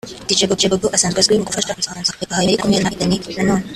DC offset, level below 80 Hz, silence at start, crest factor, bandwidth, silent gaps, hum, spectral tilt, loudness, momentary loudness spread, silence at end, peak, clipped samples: under 0.1%; -44 dBFS; 0.05 s; 18 dB; 14 kHz; none; none; -3.5 dB/octave; -16 LUFS; 6 LU; 0 s; 0 dBFS; under 0.1%